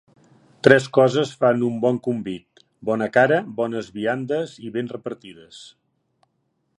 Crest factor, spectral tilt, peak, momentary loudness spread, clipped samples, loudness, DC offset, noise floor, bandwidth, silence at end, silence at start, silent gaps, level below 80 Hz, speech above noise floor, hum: 22 dB; -6 dB/octave; 0 dBFS; 18 LU; under 0.1%; -21 LUFS; under 0.1%; -71 dBFS; 11 kHz; 1.1 s; 0.65 s; none; -64 dBFS; 50 dB; none